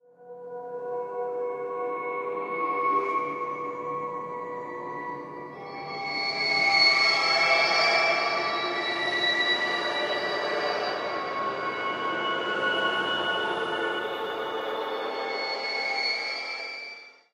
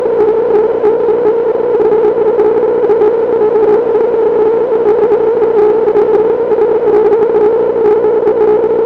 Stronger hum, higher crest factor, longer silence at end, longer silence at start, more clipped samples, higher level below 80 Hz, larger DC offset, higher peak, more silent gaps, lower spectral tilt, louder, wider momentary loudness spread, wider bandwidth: second, none vs 60 Hz at -35 dBFS; first, 18 dB vs 8 dB; first, 0.2 s vs 0 s; first, 0.2 s vs 0 s; neither; second, -74 dBFS vs -46 dBFS; neither; second, -10 dBFS vs -2 dBFS; neither; second, -2.5 dB/octave vs -8.5 dB/octave; second, -26 LUFS vs -10 LUFS; first, 15 LU vs 2 LU; first, 14.5 kHz vs 4.3 kHz